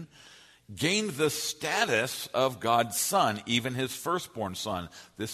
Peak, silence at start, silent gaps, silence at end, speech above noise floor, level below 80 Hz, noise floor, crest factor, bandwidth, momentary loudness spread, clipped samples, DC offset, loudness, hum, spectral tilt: -10 dBFS; 0 s; none; 0 s; 26 dB; -66 dBFS; -55 dBFS; 20 dB; 13.5 kHz; 10 LU; under 0.1%; under 0.1%; -29 LUFS; none; -3 dB/octave